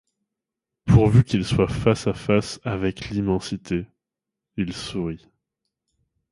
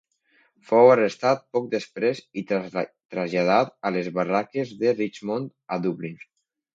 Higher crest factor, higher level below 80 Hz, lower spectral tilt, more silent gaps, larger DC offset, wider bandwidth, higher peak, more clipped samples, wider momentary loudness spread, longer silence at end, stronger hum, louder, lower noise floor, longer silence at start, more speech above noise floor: about the same, 20 dB vs 20 dB; first, -40 dBFS vs -72 dBFS; about the same, -7 dB/octave vs -6.5 dB/octave; second, none vs 3.05-3.09 s; neither; first, 11.5 kHz vs 7.8 kHz; about the same, -2 dBFS vs -4 dBFS; neither; about the same, 14 LU vs 14 LU; first, 1.15 s vs 0.6 s; neither; about the same, -22 LUFS vs -24 LUFS; first, -86 dBFS vs -64 dBFS; first, 0.85 s vs 0.7 s; first, 64 dB vs 41 dB